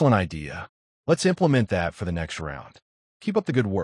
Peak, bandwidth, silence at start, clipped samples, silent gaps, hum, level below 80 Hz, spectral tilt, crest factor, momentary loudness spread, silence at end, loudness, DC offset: -8 dBFS; 11.5 kHz; 0 s; under 0.1%; 0.69-1.04 s, 2.82-3.20 s; none; -50 dBFS; -6.5 dB/octave; 18 dB; 15 LU; 0 s; -25 LUFS; under 0.1%